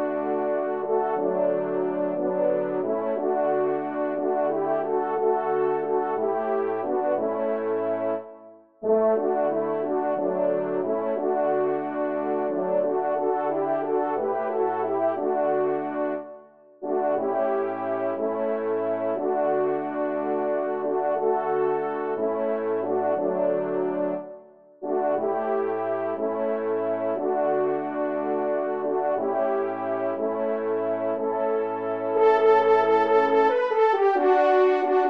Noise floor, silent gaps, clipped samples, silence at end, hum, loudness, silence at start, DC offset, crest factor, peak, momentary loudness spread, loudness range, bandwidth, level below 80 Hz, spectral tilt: -48 dBFS; none; under 0.1%; 0 s; none; -25 LUFS; 0 s; 0.1%; 16 dB; -8 dBFS; 7 LU; 5 LU; 5.6 kHz; -78 dBFS; -8 dB/octave